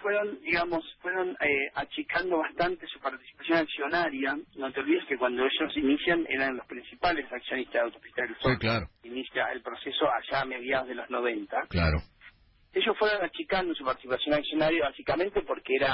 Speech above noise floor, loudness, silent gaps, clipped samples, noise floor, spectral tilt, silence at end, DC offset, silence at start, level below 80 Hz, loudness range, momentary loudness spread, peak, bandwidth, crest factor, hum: 27 dB; -29 LUFS; none; under 0.1%; -57 dBFS; -9.5 dB/octave; 0 s; under 0.1%; 0 s; -48 dBFS; 2 LU; 8 LU; -14 dBFS; 5.8 kHz; 16 dB; none